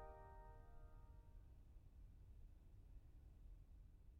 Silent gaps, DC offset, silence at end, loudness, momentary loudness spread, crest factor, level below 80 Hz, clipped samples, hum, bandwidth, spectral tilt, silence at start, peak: none; under 0.1%; 0 s; -66 LUFS; 5 LU; 16 dB; -62 dBFS; under 0.1%; none; 4 kHz; -7.5 dB/octave; 0 s; -46 dBFS